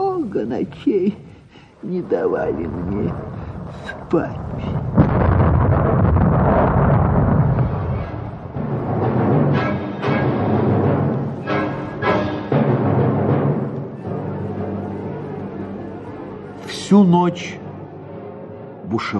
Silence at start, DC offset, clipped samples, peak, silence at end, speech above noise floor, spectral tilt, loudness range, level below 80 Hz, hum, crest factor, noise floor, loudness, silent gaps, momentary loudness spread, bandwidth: 0 s; under 0.1%; under 0.1%; -2 dBFS; 0 s; 25 dB; -8.5 dB/octave; 7 LU; -32 dBFS; none; 18 dB; -44 dBFS; -19 LUFS; none; 16 LU; 9.6 kHz